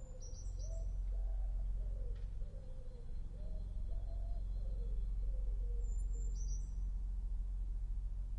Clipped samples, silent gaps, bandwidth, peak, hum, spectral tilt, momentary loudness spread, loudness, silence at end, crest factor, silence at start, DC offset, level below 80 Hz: under 0.1%; none; 7.8 kHz; -30 dBFS; none; -6.5 dB/octave; 7 LU; -46 LUFS; 0 s; 10 dB; 0 s; under 0.1%; -40 dBFS